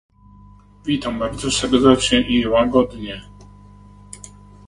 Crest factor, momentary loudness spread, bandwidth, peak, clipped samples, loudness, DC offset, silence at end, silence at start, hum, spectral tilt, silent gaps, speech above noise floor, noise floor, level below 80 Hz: 20 dB; 24 LU; 11.5 kHz; 0 dBFS; under 0.1%; -17 LUFS; under 0.1%; 0.4 s; 0.85 s; 50 Hz at -35 dBFS; -4 dB/octave; none; 28 dB; -46 dBFS; -40 dBFS